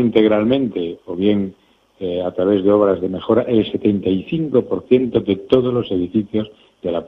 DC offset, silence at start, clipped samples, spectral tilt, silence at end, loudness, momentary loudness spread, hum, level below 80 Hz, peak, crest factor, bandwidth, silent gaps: under 0.1%; 0 s; under 0.1%; -9.5 dB/octave; 0 s; -18 LUFS; 10 LU; none; -50 dBFS; 0 dBFS; 18 dB; 5 kHz; none